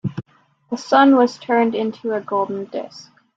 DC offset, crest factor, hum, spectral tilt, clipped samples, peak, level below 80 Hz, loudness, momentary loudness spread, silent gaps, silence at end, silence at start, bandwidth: under 0.1%; 18 dB; none; -6 dB/octave; under 0.1%; -2 dBFS; -66 dBFS; -18 LUFS; 17 LU; none; 0.35 s; 0.05 s; 7.8 kHz